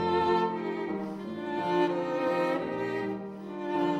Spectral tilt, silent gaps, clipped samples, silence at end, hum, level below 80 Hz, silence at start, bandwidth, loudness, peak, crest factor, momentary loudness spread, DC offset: -7 dB/octave; none; under 0.1%; 0 s; none; -66 dBFS; 0 s; 9 kHz; -30 LUFS; -14 dBFS; 14 dB; 10 LU; under 0.1%